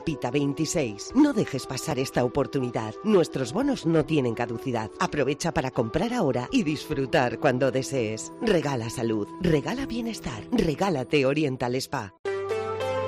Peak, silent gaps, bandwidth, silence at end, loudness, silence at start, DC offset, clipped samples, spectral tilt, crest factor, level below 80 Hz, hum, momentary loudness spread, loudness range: -10 dBFS; 12.19-12.24 s; 13.5 kHz; 0 s; -26 LUFS; 0 s; under 0.1%; under 0.1%; -5.5 dB/octave; 16 dB; -50 dBFS; none; 7 LU; 2 LU